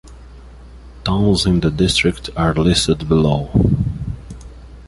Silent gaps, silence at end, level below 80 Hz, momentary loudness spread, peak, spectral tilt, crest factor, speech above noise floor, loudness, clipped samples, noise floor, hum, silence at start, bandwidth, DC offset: none; 0 s; -30 dBFS; 13 LU; -2 dBFS; -5.5 dB/octave; 16 dB; 23 dB; -16 LUFS; under 0.1%; -38 dBFS; none; 0.05 s; 11.5 kHz; under 0.1%